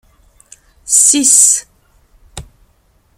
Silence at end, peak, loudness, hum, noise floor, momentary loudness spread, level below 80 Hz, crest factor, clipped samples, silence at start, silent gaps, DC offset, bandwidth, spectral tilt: 0.75 s; 0 dBFS; -8 LUFS; none; -54 dBFS; 6 LU; -46 dBFS; 16 dB; 0.2%; 0.85 s; none; under 0.1%; over 20 kHz; 0 dB/octave